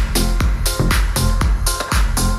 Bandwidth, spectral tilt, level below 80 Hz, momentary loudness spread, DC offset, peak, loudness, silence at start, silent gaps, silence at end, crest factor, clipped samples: 16 kHz; -4 dB/octave; -18 dBFS; 2 LU; under 0.1%; -4 dBFS; -18 LUFS; 0 s; none; 0 s; 12 dB; under 0.1%